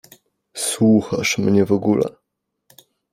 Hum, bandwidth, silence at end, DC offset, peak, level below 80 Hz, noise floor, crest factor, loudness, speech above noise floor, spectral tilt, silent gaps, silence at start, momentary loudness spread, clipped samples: none; 15.5 kHz; 1 s; under 0.1%; -4 dBFS; -56 dBFS; -77 dBFS; 16 dB; -18 LUFS; 60 dB; -5 dB/octave; none; 0.55 s; 9 LU; under 0.1%